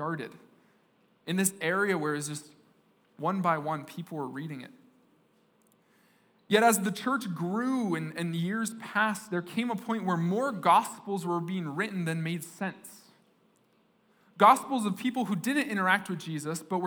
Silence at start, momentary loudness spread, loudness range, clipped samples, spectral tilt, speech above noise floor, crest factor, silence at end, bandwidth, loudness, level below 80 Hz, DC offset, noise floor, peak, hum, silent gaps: 0 s; 13 LU; 7 LU; under 0.1%; -4.5 dB/octave; 38 dB; 24 dB; 0 s; over 20 kHz; -29 LUFS; -88 dBFS; under 0.1%; -67 dBFS; -8 dBFS; none; none